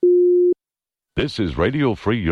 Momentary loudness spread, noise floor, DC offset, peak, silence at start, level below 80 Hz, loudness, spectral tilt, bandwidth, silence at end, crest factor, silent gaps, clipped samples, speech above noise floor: 11 LU; -90 dBFS; under 0.1%; -8 dBFS; 0 s; -40 dBFS; -19 LUFS; -8 dB/octave; 6.4 kHz; 0 s; 10 dB; none; under 0.1%; 70 dB